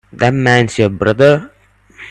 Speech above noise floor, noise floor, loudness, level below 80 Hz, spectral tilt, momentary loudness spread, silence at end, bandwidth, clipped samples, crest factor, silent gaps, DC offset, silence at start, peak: 29 dB; -40 dBFS; -12 LUFS; -44 dBFS; -6 dB/octave; 5 LU; 0 s; 10.5 kHz; under 0.1%; 14 dB; none; under 0.1%; 0.15 s; 0 dBFS